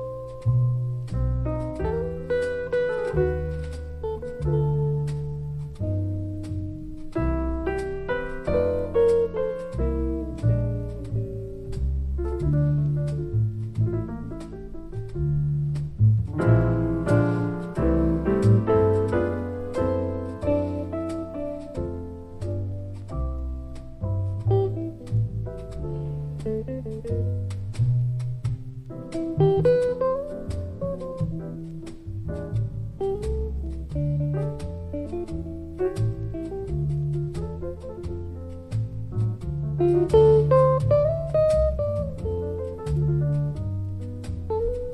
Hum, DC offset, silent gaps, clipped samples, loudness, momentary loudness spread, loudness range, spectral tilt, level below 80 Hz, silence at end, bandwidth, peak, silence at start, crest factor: none; under 0.1%; none; under 0.1%; -26 LUFS; 13 LU; 8 LU; -9.5 dB/octave; -36 dBFS; 0 s; 11 kHz; -6 dBFS; 0 s; 18 dB